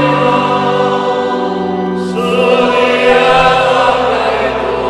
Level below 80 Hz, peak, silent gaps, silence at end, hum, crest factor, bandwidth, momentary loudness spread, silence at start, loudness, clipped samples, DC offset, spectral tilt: -38 dBFS; 0 dBFS; none; 0 s; none; 12 dB; 11.5 kHz; 7 LU; 0 s; -11 LUFS; under 0.1%; under 0.1%; -5.5 dB/octave